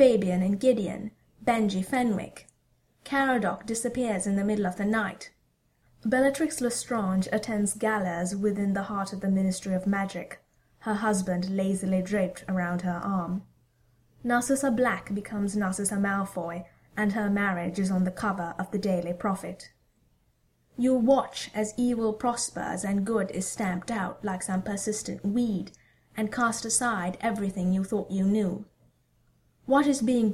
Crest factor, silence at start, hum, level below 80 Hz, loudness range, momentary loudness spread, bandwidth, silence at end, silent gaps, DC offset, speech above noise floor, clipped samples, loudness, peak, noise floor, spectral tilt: 20 dB; 0 s; none; -58 dBFS; 2 LU; 10 LU; 15 kHz; 0 s; none; under 0.1%; 42 dB; under 0.1%; -28 LUFS; -8 dBFS; -69 dBFS; -5.5 dB/octave